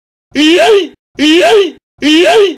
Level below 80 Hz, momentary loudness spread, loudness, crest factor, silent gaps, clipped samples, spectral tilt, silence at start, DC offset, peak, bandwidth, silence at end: -48 dBFS; 11 LU; -8 LUFS; 8 dB; 0.99-1.14 s, 1.83-1.98 s; under 0.1%; -2.5 dB/octave; 0.35 s; 0.1%; 0 dBFS; 15 kHz; 0 s